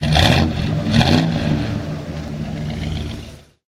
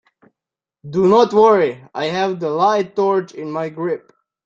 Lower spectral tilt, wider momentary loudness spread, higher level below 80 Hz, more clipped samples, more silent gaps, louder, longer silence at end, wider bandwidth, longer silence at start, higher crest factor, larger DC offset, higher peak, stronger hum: about the same, -5.5 dB/octave vs -6.5 dB/octave; about the same, 14 LU vs 13 LU; first, -30 dBFS vs -60 dBFS; neither; neither; about the same, -19 LUFS vs -17 LUFS; second, 0.35 s vs 0.5 s; first, 15 kHz vs 7.6 kHz; second, 0 s vs 0.85 s; about the same, 18 dB vs 16 dB; neither; about the same, 0 dBFS vs -2 dBFS; neither